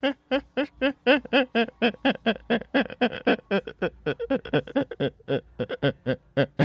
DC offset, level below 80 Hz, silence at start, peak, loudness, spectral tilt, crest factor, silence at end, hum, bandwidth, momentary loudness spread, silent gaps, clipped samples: under 0.1%; -56 dBFS; 0.05 s; -8 dBFS; -26 LUFS; -7.5 dB/octave; 18 dB; 0 s; none; 6.6 kHz; 8 LU; none; under 0.1%